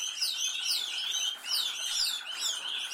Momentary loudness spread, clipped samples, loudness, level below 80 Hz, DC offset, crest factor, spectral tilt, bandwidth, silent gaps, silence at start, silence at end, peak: 3 LU; under 0.1%; -30 LUFS; -84 dBFS; under 0.1%; 16 dB; 4.5 dB/octave; 16.5 kHz; none; 0 s; 0 s; -16 dBFS